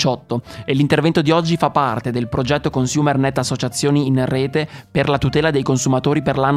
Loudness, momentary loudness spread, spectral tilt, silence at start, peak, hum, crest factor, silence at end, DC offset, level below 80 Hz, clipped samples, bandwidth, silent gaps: -18 LUFS; 6 LU; -5.5 dB/octave; 0 s; -2 dBFS; none; 16 dB; 0 s; under 0.1%; -42 dBFS; under 0.1%; 13.5 kHz; none